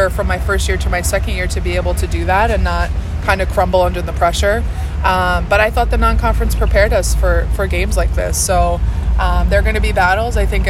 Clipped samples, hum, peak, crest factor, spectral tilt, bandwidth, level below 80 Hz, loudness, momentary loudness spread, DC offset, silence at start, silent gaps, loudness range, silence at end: under 0.1%; none; 0 dBFS; 14 dB; -5 dB/octave; 14.5 kHz; -18 dBFS; -15 LUFS; 5 LU; under 0.1%; 0 s; none; 2 LU; 0 s